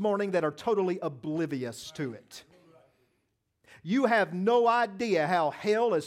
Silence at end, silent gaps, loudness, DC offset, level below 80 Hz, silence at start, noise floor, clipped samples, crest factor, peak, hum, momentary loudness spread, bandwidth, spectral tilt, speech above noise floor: 0 s; none; -28 LUFS; under 0.1%; -76 dBFS; 0 s; -77 dBFS; under 0.1%; 18 dB; -12 dBFS; none; 13 LU; 14.5 kHz; -6 dB/octave; 49 dB